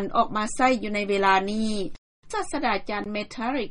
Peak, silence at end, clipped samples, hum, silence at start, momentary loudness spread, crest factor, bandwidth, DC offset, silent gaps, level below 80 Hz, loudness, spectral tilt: -6 dBFS; 0 s; under 0.1%; none; 0 s; 11 LU; 18 dB; 11.5 kHz; under 0.1%; 1.98-2.23 s; -46 dBFS; -25 LUFS; -4 dB/octave